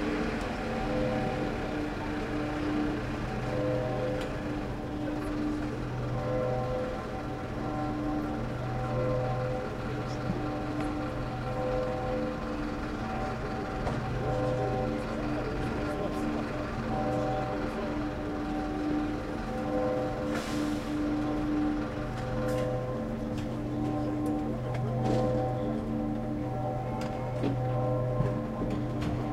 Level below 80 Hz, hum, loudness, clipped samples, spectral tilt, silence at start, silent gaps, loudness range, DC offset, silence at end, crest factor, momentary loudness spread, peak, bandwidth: -42 dBFS; none; -32 LUFS; under 0.1%; -7.5 dB/octave; 0 s; none; 2 LU; under 0.1%; 0 s; 16 dB; 4 LU; -14 dBFS; 14 kHz